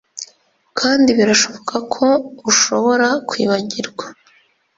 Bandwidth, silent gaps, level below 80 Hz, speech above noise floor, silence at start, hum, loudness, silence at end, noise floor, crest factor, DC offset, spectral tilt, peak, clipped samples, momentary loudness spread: 7.8 kHz; none; -60 dBFS; 39 dB; 0.15 s; none; -15 LUFS; 0.65 s; -55 dBFS; 16 dB; under 0.1%; -2.5 dB/octave; -2 dBFS; under 0.1%; 19 LU